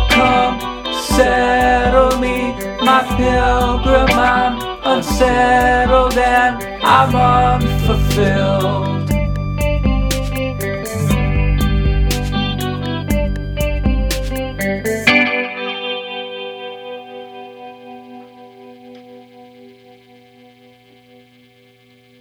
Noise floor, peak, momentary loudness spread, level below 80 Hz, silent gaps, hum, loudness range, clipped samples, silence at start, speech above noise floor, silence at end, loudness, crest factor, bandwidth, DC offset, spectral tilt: -49 dBFS; 0 dBFS; 14 LU; -24 dBFS; none; none; 10 LU; under 0.1%; 0 s; 37 dB; 2.5 s; -15 LUFS; 16 dB; over 20 kHz; under 0.1%; -5.5 dB/octave